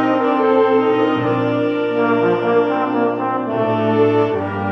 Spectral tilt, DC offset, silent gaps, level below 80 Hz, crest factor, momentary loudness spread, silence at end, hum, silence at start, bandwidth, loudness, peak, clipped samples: -8.5 dB/octave; under 0.1%; none; -64 dBFS; 12 dB; 5 LU; 0 s; none; 0 s; 6 kHz; -17 LUFS; -4 dBFS; under 0.1%